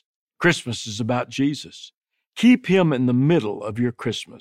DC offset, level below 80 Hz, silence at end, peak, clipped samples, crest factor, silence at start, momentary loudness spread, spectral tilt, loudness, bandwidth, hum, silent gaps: under 0.1%; -62 dBFS; 0.05 s; -4 dBFS; under 0.1%; 18 dB; 0.4 s; 13 LU; -6 dB/octave; -21 LUFS; 12 kHz; none; 1.97-2.02 s